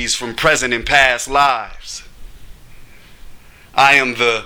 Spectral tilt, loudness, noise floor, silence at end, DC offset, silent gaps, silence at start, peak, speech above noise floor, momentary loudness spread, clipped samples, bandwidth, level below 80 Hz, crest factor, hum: -2 dB/octave; -13 LUFS; -38 dBFS; 0 s; under 0.1%; none; 0 s; 0 dBFS; 23 dB; 19 LU; under 0.1%; over 20 kHz; -38 dBFS; 18 dB; none